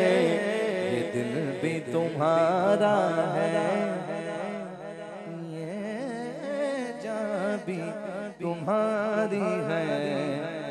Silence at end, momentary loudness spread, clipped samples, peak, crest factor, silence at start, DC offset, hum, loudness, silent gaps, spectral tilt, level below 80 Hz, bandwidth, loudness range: 0 s; 12 LU; under 0.1%; -12 dBFS; 16 dB; 0 s; under 0.1%; none; -28 LUFS; none; -6 dB/octave; -74 dBFS; 12 kHz; 7 LU